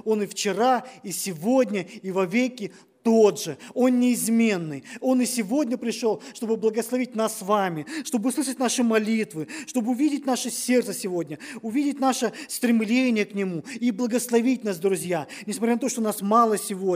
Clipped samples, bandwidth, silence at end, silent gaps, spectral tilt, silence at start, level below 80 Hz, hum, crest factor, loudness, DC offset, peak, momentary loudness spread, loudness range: under 0.1%; 16 kHz; 0 s; none; -4.5 dB/octave; 0.05 s; -80 dBFS; none; 18 dB; -24 LUFS; under 0.1%; -6 dBFS; 9 LU; 3 LU